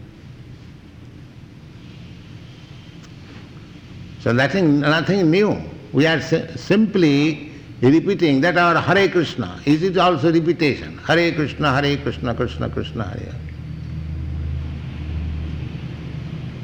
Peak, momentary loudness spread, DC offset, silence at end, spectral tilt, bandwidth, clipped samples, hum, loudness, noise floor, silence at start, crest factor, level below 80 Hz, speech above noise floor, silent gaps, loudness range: -6 dBFS; 24 LU; under 0.1%; 0 s; -6.5 dB/octave; 19.5 kHz; under 0.1%; none; -19 LUFS; -40 dBFS; 0 s; 14 dB; -38 dBFS; 23 dB; none; 12 LU